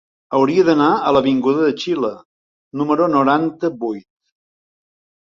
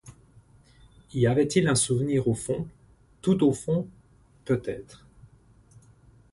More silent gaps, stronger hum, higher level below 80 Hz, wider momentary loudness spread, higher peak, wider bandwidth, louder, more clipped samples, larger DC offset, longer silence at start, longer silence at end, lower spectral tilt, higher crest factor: first, 2.25-2.71 s vs none; neither; about the same, -58 dBFS vs -56 dBFS; second, 11 LU vs 16 LU; first, -2 dBFS vs -8 dBFS; second, 7.4 kHz vs 11.5 kHz; first, -17 LUFS vs -26 LUFS; neither; neither; first, 0.3 s vs 0.05 s; about the same, 1.25 s vs 1.35 s; about the same, -6.5 dB/octave vs -5.5 dB/octave; about the same, 16 dB vs 20 dB